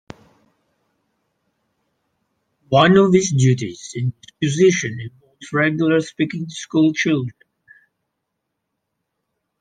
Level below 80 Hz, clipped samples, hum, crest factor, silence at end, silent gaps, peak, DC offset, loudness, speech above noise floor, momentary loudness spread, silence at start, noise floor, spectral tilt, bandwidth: -60 dBFS; under 0.1%; none; 20 dB; 2.3 s; none; 0 dBFS; under 0.1%; -18 LUFS; 60 dB; 15 LU; 2.7 s; -77 dBFS; -5.5 dB/octave; 9.6 kHz